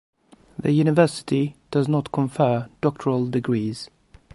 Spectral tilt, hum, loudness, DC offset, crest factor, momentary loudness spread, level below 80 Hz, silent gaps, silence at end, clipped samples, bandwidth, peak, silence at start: -7.5 dB/octave; none; -22 LUFS; under 0.1%; 18 dB; 10 LU; -58 dBFS; none; 0.5 s; under 0.1%; 11.5 kHz; -4 dBFS; 0.6 s